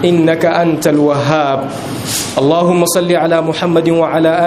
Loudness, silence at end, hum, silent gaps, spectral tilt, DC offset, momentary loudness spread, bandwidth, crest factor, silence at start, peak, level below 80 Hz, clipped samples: -12 LUFS; 0 s; none; none; -5 dB/octave; under 0.1%; 6 LU; 15.5 kHz; 12 dB; 0 s; 0 dBFS; -48 dBFS; under 0.1%